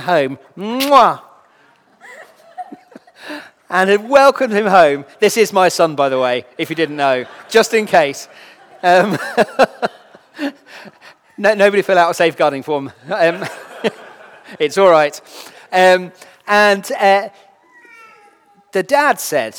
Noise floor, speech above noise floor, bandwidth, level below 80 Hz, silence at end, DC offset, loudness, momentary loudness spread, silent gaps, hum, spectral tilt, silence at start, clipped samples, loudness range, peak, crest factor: -52 dBFS; 38 dB; over 20 kHz; -64 dBFS; 0 s; under 0.1%; -14 LUFS; 19 LU; none; none; -4 dB/octave; 0 s; 0.1%; 4 LU; 0 dBFS; 16 dB